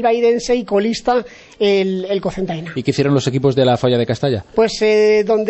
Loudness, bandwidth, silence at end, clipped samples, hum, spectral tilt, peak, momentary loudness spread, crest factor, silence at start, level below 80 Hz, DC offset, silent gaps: -16 LUFS; 8.4 kHz; 0 s; under 0.1%; none; -6 dB/octave; -2 dBFS; 7 LU; 14 dB; 0 s; -46 dBFS; under 0.1%; none